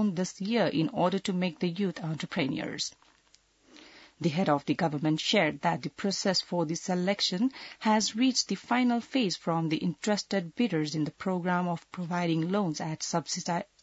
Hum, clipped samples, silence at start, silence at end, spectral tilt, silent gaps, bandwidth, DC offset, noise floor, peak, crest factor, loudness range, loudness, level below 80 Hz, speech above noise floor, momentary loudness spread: none; under 0.1%; 0 s; 0.2 s; -4.5 dB/octave; none; 8 kHz; under 0.1%; -65 dBFS; -12 dBFS; 18 dB; 4 LU; -29 LUFS; -72 dBFS; 36 dB; 7 LU